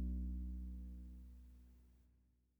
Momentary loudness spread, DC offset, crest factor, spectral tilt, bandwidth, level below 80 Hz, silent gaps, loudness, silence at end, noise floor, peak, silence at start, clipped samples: 21 LU; under 0.1%; 12 dB; -10 dB/octave; 1 kHz; -50 dBFS; none; -50 LUFS; 0.5 s; -75 dBFS; -36 dBFS; 0 s; under 0.1%